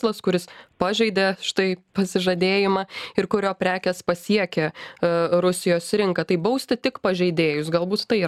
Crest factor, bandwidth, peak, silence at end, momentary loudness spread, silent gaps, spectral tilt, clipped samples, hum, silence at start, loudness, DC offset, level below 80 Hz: 18 dB; 14.5 kHz; -4 dBFS; 0 s; 6 LU; none; -5 dB/octave; under 0.1%; none; 0 s; -22 LUFS; under 0.1%; -60 dBFS